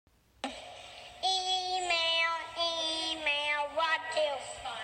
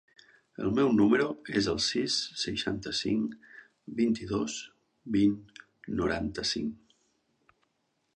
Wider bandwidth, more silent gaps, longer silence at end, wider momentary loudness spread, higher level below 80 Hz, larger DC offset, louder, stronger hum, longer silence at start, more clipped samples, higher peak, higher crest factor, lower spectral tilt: first, 15.5 kHz vs 10 kHz; neither; second, 0 s vs 1.4 s; about the same, 14 LU vs 15 LU; second, -66 dBFS vs -56 dBFS; neither; about the same, -31 LUFS vs -30 LUFS; neither; second, 0.45 s vs 0.6 s; neither; second, -18 dBFS vs -12 dBFS; about the same, 16 dB vs 18 dB; second, -0.5 dB/octave vs -4.5 dB/octave